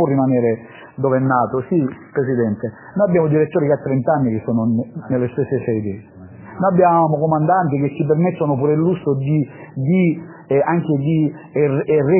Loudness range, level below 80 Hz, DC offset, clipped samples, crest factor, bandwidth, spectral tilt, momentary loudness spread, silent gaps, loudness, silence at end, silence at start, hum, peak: 2 LU; -54 dBFS; under 0.1%; under 0.1%; 14 dB; 3.2 kHz; -13 dB/octave; 7 LU; none; -18 LUFS; 0 s; 0 s; none; -2 dBFS